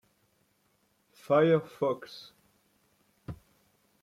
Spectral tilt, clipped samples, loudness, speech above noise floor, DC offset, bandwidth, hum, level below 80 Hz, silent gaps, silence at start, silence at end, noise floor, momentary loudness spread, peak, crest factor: -7.5 dB/octave; under 0.1%; -28 LUFS; 44 dB; under 0.1%; 14.5 kHz; none; -66 dBFS; none; 1.3 s; 0.65 s; -72 dBFS; 25 LU; -14 dBFS; 20 dB